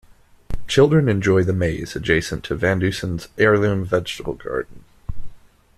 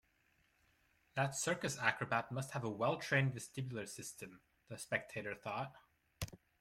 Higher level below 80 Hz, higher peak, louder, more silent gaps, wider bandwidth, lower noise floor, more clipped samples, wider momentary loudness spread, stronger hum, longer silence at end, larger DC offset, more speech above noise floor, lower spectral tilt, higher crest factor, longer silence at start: first, -38 dBFS vs -70 dBFS; first, -2 dBFS vs -18 dBFS; first, -20 LUFS vs -40 LUFS; neither; second, 14 kHz vs 16 kHz; second, -39 dBFS vs -76 dBFS; neither; first, 21 LU vs 14 LU; neither; first, 0.4 s vs 0.25 s; neither; second, 20 dB vs 36 dB; first, -6 dB/octave vs -4.5 dB/octave; second, 18 dB vs 24 dB; second, 0.5 s vs 1.15 s